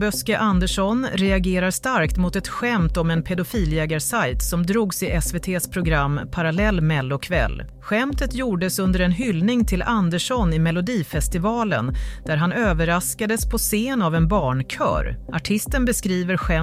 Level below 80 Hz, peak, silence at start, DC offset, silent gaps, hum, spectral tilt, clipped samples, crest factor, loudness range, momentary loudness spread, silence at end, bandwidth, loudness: -30 dBFS; -8 dBFS; 0 s; under 0.1%; none; none; -5 dB/octave; under 0.1%; 14 dB; 1 LU; 4 LU; 0 s; 16 kHz; -21 LUFS